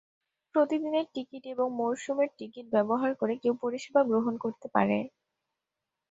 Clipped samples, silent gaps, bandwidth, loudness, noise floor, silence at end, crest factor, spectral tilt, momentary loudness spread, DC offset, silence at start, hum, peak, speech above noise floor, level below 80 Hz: under 0.1%; none; 8 kHz; -30 LUFS; -87 dBFS; 1.05 s; 22 dB; -6.5 dB/octave; 9 LU; under 0.1%; 0.55 s; none; -8 dBFS; 59 dB; -74 dBFS